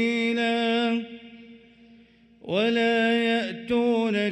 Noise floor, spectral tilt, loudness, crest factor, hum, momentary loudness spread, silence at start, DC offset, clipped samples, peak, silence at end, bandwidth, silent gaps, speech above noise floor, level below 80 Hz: -55 dBFS; -5.5 dB/octave; -24 LUFS; 14 dB; none; 9 LU; 0 s; under 0.1%; under 0.1%; -12 dBFS; 0 s; 10.5 kHz; none; 32 dB; -66 dBFS